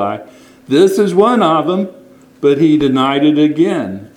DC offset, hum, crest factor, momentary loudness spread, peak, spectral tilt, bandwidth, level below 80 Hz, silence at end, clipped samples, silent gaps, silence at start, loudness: under 0.1%; none; 12 dB; 9 LU; 0 dBFS; -6.5 dB/octave; 15 kHz; -52 dBFS; 0.1 s; under 0.1%; none; 0 s; -12 LUFS